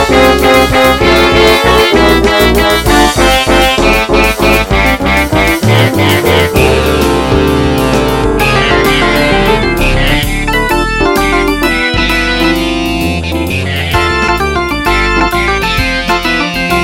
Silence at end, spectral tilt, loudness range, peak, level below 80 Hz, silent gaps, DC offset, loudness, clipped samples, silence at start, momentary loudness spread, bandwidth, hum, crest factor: 0 s; -4.5 dB/octave; 4 LU; 0 dBFS; -18 dBFS; none; 1%; -9 LUFS; 0.2%; 0 s; 5 LU; 17.5 kHz; none; 8 dB